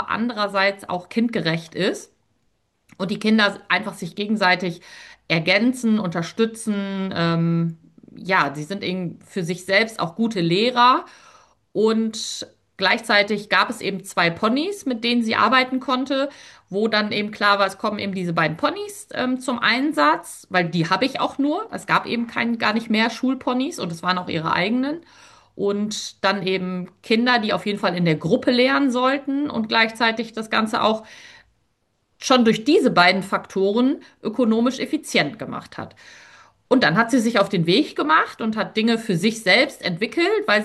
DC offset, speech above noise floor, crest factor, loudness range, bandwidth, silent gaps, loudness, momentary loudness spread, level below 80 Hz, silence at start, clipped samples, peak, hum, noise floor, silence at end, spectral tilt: under 0.1%; 48 dB; 20 dB; 4 LU; 12.5 kHz; none; -20 LUFS; 11 LU; -66 dBFS; 0 s; under 0.1%; -2 dBFS; none; -69 dBFS; 0 s; -5 dB/octave